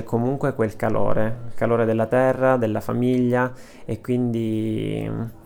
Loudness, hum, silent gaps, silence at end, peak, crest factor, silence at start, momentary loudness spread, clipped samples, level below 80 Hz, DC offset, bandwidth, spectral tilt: -22 LUFS; none; none; 0.05 s; -6 dBFS; 16 dB; 0 s; 8 LU; under 0.1%; -44 dBFS; under 0.1%; 17 kHz; -8.5 dB/octave